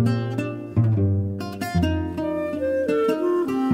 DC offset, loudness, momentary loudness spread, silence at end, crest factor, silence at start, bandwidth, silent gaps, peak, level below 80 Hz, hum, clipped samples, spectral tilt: under 0.1%; -23 LUFS; 6 LU; 0 s; 14 dB; 0 s; 16 kHz; none; -8 dBFS; -44 dBFS; none; under 0.1%; -8 dB/octave